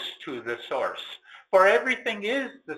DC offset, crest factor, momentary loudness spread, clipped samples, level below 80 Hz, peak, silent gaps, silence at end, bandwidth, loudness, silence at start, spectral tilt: under 0.1%; 20 dB; 18 LU; under 0.1%; -72 dBFS; -6 dBFS; none; 0 s; 14 kHz; -25 LUFS; 0 s; -3.5 dB/octave